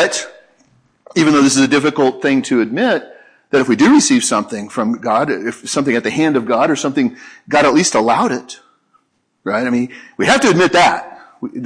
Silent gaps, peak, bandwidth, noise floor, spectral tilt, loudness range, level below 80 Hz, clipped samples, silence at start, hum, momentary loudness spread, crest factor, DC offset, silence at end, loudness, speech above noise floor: none; 0 dBFS; 11 kHz; -60 dBFS; -4 dB/octave; 3 LU; -56 dBFS; under 0.1%; 0 s; none; 11 LU; 14 dB; under 0.1%; 0 s; -14 LUFS; 46 dB